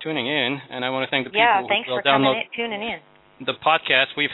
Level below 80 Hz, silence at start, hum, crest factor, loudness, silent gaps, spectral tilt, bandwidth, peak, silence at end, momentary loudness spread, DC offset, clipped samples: -64 dBFS; 0 s; none; 20 dB; -21 LUFS; none; -7 dB/octave; 4.1 kHz; -2 dBFS; 0 s; 11 LU; under 0.1%; under 0.1%